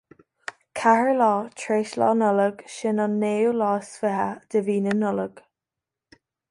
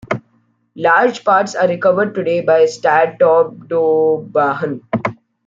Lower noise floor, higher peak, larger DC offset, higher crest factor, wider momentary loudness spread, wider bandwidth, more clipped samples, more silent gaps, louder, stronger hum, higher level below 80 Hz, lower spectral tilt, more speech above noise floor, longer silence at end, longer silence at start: first, -87 dBFS vs -59 dBFS; second, -6 dBFS vs -2 dBFS; neither; about the same, 18 dB vs 14 dB; about the same, 10 LU vs 9 LU; first, 11.5 kHz vs 7.6 kHz; neither; neither; second, -23 LUFS vs -15 LUFS; neither; second, -70 dBFS vs -60 dBFS; about the same, -6 dB/octave vs -5.5 dB/octave; first, 65 dB vs 45 dB; first, 1.1 s vs 0.35 s; first, 0.75 s vs 0.1 s